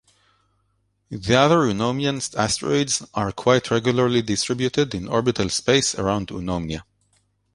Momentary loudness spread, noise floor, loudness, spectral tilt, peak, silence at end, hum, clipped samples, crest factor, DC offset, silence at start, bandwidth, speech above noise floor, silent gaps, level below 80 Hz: 9 LU; -68 dBFS; -21 LUFS; -4.5 dB/octave; -2 dBFS; 0.7 s; none; under 0.1%; 20 dB; under 0.1%; 1.1 s; 11.5 kHz; 47 dB; none; -48 dBFS